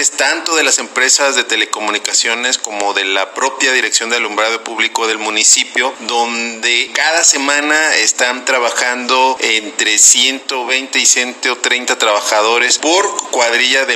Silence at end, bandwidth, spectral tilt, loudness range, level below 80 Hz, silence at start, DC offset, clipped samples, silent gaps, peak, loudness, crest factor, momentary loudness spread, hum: 0 s; 16 kHz; 2 dB/octave; 3 LU; -76 dBFS; 0 s; under 0.1%; under 0.1%; none; 0 dBFS; -12 LUFS; 14 dB; 7 LU; none